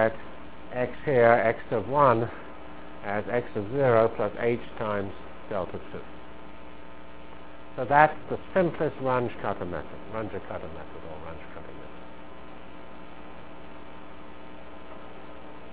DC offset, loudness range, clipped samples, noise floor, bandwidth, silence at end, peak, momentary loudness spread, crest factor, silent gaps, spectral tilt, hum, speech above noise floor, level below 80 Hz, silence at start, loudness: 1%; 20 LU; under 0.1%; -46 dBFS; 4 kHz; 0 s; -2 dBFS; 24 LU; 26 dB; none; -10 dB/octave; none; 20 dB; -54 dBFS; 0 s; -27 LUFS